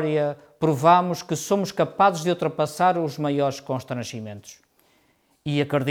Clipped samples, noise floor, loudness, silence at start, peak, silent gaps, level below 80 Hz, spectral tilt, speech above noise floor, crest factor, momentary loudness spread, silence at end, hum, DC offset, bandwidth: under 0.1%; -64 dBFS; -23 LUFS; 0 s; -4 dBFS; none; -64 dBFS; -5.5 dB/octave; 41 dB; 20 dB; 13 LU; 0 s; none; under 0.1%; 18.5 kHz